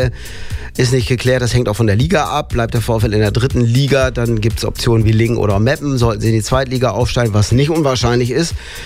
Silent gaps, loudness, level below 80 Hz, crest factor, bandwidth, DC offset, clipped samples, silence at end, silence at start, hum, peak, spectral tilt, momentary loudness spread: none; -15 LUFS; -28 dBFS; 12 dB; 15.5 kHz; under 0.1%; under 0.1%; 0 s; 0 s; none; -2 dBFS; -6 dB/octave; 5 LU